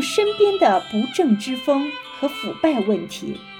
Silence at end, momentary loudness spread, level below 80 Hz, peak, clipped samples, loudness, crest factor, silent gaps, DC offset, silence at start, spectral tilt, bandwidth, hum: 0 s; 9 LU; -60 dBFS; -4 dBFS; under 0.1%; -20 LUFS; 16 dB; none; under 0.1%; 0 s; -4.5 dB/octave; 17.5 kHz; none